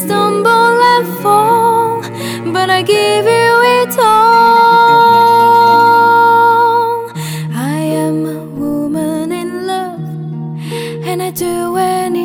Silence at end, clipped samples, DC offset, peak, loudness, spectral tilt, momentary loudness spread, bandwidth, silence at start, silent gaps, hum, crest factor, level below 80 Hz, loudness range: 0 s; under 0.1%; under 0.1%; 0 dBFS; -10 LUFS; -4.5 dB/octave; 14 LU; 19 kHz; 0 s; none; none; 10 dB; -54 dBFS; 11 LU